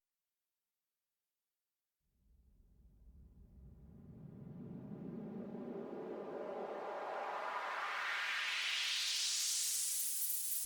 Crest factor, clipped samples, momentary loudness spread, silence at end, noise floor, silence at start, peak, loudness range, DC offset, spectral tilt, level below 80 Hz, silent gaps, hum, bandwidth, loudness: 18 dB; under 0.1%; 17 LU; 0 s; under -90 dBFS; 2.8 s; -24 dBFS; 19 LU; under 0.1%; -1 dB/octave; -70 dBFS; none; none; over 20 kHz; -38 LUFS